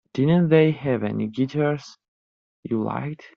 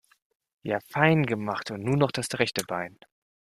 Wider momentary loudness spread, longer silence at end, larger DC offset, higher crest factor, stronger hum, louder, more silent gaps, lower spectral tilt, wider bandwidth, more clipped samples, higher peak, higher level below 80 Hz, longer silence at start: about the same, 12 LU vs 11 LU; second, 0.2 s vs 0.65 s; neither; about the same, 18 dB vs 22 dB; neither; first, -22 LUFS vs -27 LUFS; first, 2.08-2.63 s vs none; first, -7.5 dB/octave vs -5.5 dB/octave; second, 6.8 kHz vs 14.5 kHz; neither; about the same, -4 dBFS vs -6 dBFS; about the same, -62 dBFS vs -64 dBFS; second, 0.15 s vs 0.65 s